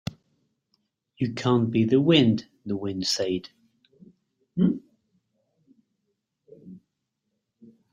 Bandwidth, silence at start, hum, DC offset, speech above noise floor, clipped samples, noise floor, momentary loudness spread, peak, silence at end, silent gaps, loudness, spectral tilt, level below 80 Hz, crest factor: 16 kHz; 1.2 s; none; under 0.1%; 57 dB; under 0.1%; -80 dBFS; 14 LU; -4 dBFS; 1.15 s; none; -24 LUFS; -6 dB/octave; -64 dBFS; 22 dB